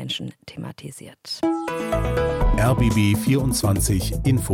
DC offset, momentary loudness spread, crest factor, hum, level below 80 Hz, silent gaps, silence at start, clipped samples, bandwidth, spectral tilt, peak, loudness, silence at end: under 0.1%; 17 LU; 12 dB; none; -30 dBFS; none; 0 s; under 0.1%; 17.5 kHz; -5.5 dB/octave; -8 dBFS; -21 LUFS; 0 s